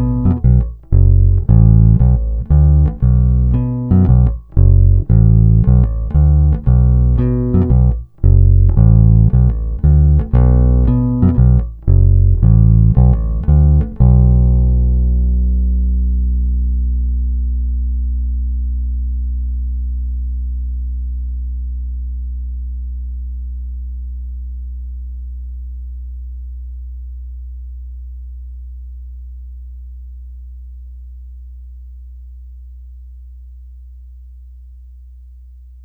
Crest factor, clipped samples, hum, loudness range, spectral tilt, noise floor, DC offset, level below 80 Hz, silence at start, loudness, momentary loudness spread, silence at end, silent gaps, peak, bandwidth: 14 dB; under 0.1%; none; 20 LU; -14 dB/octave; -37 dBFS; under 0.1%; -16 dBFS; 0 s; -14 LUFS; 22 LU; 0.45 s; none; 0 dBFS; 1.9 kHz